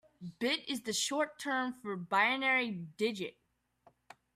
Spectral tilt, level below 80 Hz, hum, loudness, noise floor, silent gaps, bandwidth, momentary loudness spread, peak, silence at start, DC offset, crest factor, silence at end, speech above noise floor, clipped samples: -2.5 dB/octave; -80 dBFS; none; -33 LUFS; -68 dBFS; none; 15 kHz; 12 LU; -16 dBFS; 0.2 s; under 0.1%; 20 dB; 1.05 s; 34 dB; under 0.1%